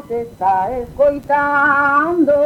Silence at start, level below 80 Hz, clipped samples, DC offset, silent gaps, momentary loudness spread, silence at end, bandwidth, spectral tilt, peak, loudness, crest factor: 0.05 s; -44 dBFS; under 0.1%; under 0.1%; none; 7 LU; 0 s; 13 kHz; -7 dB/octave; -4 dBFS; -15 LUFS; 12 dB